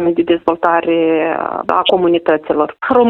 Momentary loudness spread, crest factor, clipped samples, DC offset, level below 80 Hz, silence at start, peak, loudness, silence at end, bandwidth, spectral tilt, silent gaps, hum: 4 LU; 14 dB; under 0.1%; under 0.1%; -52 dBFS; 0 s; 0 dBFS; -14 LUFS; 0 s; 4.2 kHz; -7.5 dB/octave; none; none